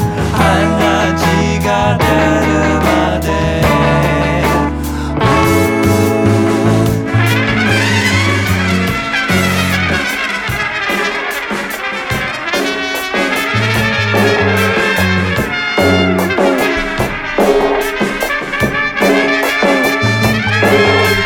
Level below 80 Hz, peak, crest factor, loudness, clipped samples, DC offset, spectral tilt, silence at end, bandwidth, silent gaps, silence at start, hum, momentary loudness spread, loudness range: -28 dBFS; 0 dBFS; 12 dB; -12 LUFS; under 0.1%; under 0.1%; -5 dB/octave; 0 s; 19 kHz; none; 0 s; none; 5 LU; 3 LU